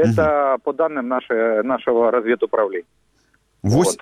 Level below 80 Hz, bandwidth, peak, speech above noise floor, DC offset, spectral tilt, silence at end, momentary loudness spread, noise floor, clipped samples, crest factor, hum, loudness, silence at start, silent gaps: -50 dBFS; 15.5 kHz; -4 dBFS; 43 dB; under 0.1%; -6 dB/octave; 0.05 s; 6 LU; -62 dBFS; under 0.1%; 14 dB; none; -19 LUFS; 0 s; none